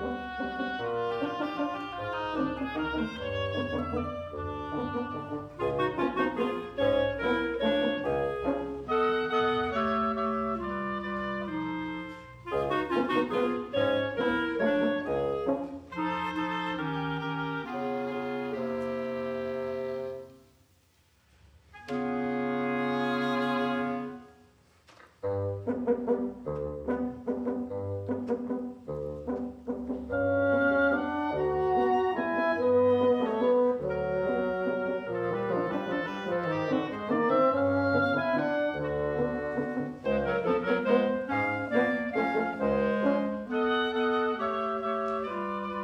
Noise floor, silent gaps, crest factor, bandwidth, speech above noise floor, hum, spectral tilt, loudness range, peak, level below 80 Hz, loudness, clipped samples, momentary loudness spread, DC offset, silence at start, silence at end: -65 dBFS; none; 18 dB; 9.2 kHz; 34 dB; none; -7.5 dB/octave; 7 LU; -12 dBFS; -54 dBFS; -30 LUFS; under 0.1%; 9 LU; under 0.1%; 0 s; 0 s